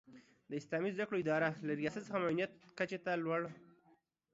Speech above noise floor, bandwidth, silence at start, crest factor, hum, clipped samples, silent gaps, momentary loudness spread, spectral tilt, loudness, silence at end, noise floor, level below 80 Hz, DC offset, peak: 35 dB; 7.6 kHz; 0.1 s; 18 dB; none; under 0.1%; none; 7 LU; -5 dB/octave; -39 LUFS; 0.7 s; -73 dBFS; -80 dBFS; under 0.1%; -22 dBFS